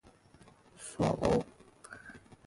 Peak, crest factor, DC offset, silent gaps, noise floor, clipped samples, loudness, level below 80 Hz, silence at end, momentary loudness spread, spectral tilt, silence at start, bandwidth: -16 dBFS; 22 dB; under 0.1%; none; -60 dBFS; under 0.1%; -32 LUFS; -54 dBFS; 0.3 s; 22 LU; -6 dB/octave; 0.8 s; 11.5 kHz